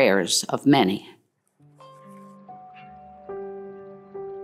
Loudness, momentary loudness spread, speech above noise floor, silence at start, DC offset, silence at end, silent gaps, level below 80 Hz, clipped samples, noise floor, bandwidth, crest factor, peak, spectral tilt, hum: -22 LUFS; 27 LU; 41 dB; 0 s; under 0.1%; 0 s; none; -70 dBFS; under 0.1%; -62 dBFS; 16 kHz; 22 dB; -6 dBFS; -4 dB/octave; none